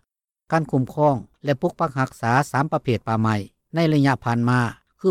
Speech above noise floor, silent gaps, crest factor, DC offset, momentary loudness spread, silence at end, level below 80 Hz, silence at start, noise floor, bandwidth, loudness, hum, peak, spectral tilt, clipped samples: 54 dB; none; 16 dB; under 0.1%; 6 LU; 0 s; -56 dBFS; 0.5 s; -75 dBFS; 15 kHz; -22 LUFS; none; -6 dBFS; -7 dB/octave; under 0.1%